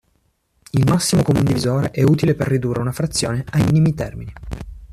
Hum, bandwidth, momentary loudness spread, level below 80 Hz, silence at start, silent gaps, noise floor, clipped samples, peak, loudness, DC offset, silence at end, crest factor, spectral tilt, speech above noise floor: none; 14.5 kHz; 16 LU; -40 dBFS; 0.75 s; none; -64 dBFS; under 0.1%; -4 dBFS; -18 LUFS; under 0.1%; 0 s; 14 dB; -6 dB/octave; 47 dB